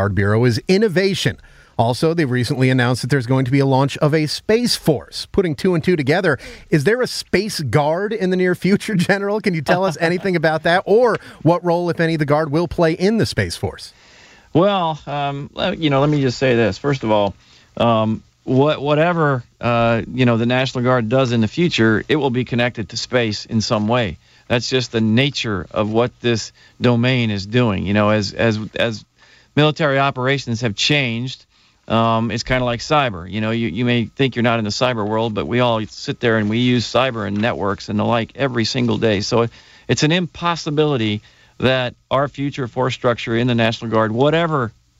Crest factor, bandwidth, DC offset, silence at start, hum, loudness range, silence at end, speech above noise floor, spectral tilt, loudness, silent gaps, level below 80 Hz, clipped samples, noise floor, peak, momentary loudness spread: 18 dB; 15.5 kHz; under 0.1%; 0 s; none; 2 LU; 0.3 s; 29 dB; -6 dB/octave; -18 LUFS; none; -46 dBFS; under 0.1%; -47 dBFS; 0 dBFS; 6 LU